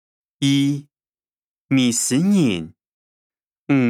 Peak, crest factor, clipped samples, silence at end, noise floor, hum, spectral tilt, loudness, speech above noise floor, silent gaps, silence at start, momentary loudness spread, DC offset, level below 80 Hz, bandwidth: -6 dBFS; 14 dB; under 0.1%; 0 s; under -90 dBFS; none; -4.5 dB/octave; -19 LUFS; over 72 dB; 1.43-1.69 s, 2.92-3.30 s, 3.43-3.51 s, 3.58-3.66 s; 0.4 s; 11 LU; under 0.1%; -68 dBFS; 14.5 kHz